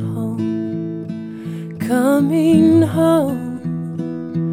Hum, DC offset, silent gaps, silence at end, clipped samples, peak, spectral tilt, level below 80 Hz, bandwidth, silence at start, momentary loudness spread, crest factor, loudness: none; under 0.1%; none; 0 s; under 0.1%; -2 dBFS; -7.5 dB/octave; -62 dBFS; 16 kHz; 0 s; 15 LU; 16 dB; -17 LUFS